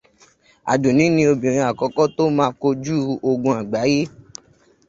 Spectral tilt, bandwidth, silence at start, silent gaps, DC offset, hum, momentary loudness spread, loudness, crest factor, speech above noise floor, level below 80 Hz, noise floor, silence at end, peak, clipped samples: -6 dB/octave; 7.8 kHz; 0.65 s; none; under 0.1%; none; 6 LU; -19 LUFS; 18 dB; 36 dB; -56 dBFS; -54 dBFS; 0.8 s; -2 dBFS; under 0.1%